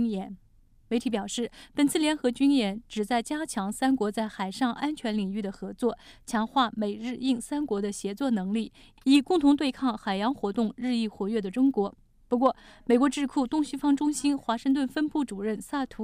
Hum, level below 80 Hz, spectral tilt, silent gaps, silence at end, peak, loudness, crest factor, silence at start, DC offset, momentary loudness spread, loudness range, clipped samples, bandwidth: none; -58 dBFS; -5 dB/octave; none; 0 s; -10 dBFS; -28 LUFS; 16 dB; 0 s; under 0.1%; 9 LU; 3 LU; under 0.1%; 15 kHz